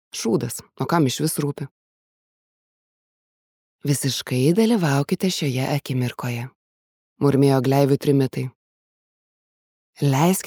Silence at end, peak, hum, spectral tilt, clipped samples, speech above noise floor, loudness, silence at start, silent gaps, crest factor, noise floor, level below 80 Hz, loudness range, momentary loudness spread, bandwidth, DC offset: 0 s; -4 dBFS; none; -6 dB/octave; under 0.1%; over 70 dB; -21 LUFS; 0.15 s; 1.71-3.79 s, 6.55-7.16 s, 8.55-9.93 s; 18 dB; under -90 dBFS; -64 dBFS; 6 LU; 13 LU; over 20 kHz; under 0.1%